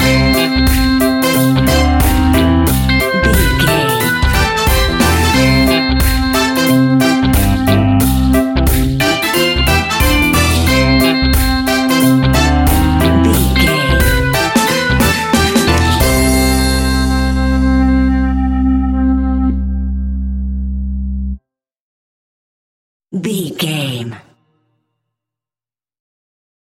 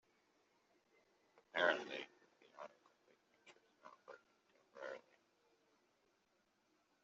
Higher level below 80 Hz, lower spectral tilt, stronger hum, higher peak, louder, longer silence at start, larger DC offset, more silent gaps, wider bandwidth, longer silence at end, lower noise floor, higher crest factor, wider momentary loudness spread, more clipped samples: first, -18 dBFS vs under -90 dBFS; first, -5 dB/octave vs 0.5 dB/octave; neither; first, 0 dBFS vs -20 dBFS; first, -12 LUFS vs -42 LUFS; second, 0 s vs 1.55 s; neither; first, 21.80-23.00 s vs none; first, 17 kHz vs 7.6 kHz; first, 2.5 s vs 2.05 s; first, under -90 dBFS vs -81 dBFS; second, 12 dB vs 32 dB; second, 9 LU vs 27 LU; neither